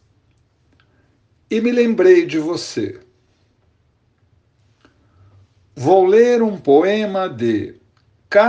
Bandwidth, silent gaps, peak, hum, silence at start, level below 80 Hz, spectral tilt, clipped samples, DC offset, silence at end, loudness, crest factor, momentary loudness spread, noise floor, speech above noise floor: 8.8 kHz; none; 0 dBFS; none; 1.5 s; -62 dBFS; -6 dB/octave; under 0.1%; under 0.1%; 0 s; -16 LUFS; 18 dB; 12 LU; -61 dBFS; 46 dB